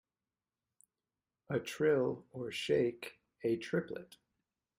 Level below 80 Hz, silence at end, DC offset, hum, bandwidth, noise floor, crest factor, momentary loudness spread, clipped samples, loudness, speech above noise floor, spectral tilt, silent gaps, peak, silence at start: -76 dBFS; 0.75 s; under 0.1%; none; 16 kHz; under -90 dBFS; 18 dB; 15 LU; under 0.1%; -36 LUFS; over 55 dB; -5.5 dB/octave; none; -20 dBFS; 1.5 s